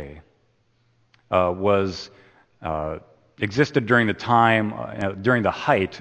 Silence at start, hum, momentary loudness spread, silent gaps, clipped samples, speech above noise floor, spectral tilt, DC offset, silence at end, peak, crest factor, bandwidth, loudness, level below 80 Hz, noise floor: 0 s; none; 15 LU; none; under 0.1%; 42 dB; -6.5 dB/octave; under 0.1%; 0 s; -2 dBFS; 20 dB; 8.8 kHz; -22 LUFS; -52 dBFS; -64 dBFS